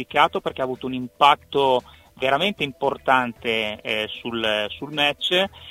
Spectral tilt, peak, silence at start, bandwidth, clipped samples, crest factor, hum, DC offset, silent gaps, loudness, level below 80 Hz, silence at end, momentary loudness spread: -4 dB/octave; 0 dBFS; 0 s; 16 kHz; under 0.1%; 22 dB; none; under 0.1%; none; -22 LUFS; -56 dBFS; 0 s; 9 LU